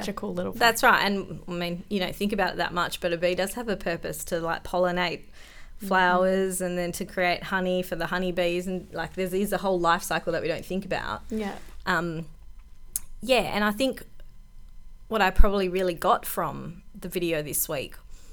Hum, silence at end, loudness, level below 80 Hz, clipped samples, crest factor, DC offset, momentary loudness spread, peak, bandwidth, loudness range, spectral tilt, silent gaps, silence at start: none; 0 s; -26 LUFS; -36 dBFS; under 0.1%; 24 dB; under 0.1%; 11 LU; -2 dBFS; over 20 kHz; 3 LU; -4 dB/octave; none; 0 s